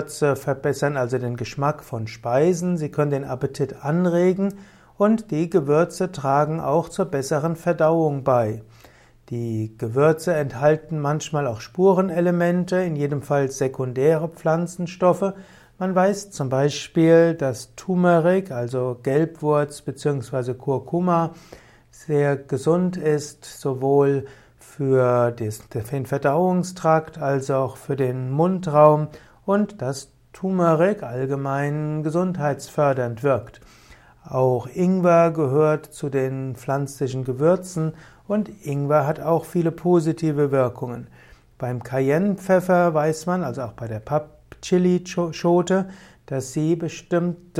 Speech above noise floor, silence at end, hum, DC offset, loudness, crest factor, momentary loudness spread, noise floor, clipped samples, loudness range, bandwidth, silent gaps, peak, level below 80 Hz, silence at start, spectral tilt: 30 dB; 0 s; none; under 0.1%; -22 LUFS; 20 dB; 10 LU; -51 dBFS; under 0.1%; 3 LU; 15.5 kHz; none; -2 dBFS; -56 dBFS; 0 s; -7 dB/octave